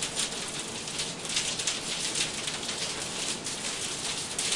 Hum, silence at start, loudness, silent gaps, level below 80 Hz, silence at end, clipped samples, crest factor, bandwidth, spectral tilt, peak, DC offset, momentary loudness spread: none; 0 s; -30 LUFS; none; -60 dBFS; 0 s; under 0.1%; 20 dB; 11.5 kHz; -0.5 dB/octave; -12 dBFS; under 0.1%; 4 LU